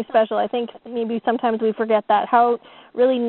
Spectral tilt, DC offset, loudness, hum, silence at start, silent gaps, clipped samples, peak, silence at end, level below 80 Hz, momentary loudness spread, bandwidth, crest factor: -3 dB/octave; under 0.1%; -20 LUFS; none; 0 s; none; under 0.1%; -2 dBFS; 0 s; -68 dBFS; 10 LU; 4.3 kHz; 16 dB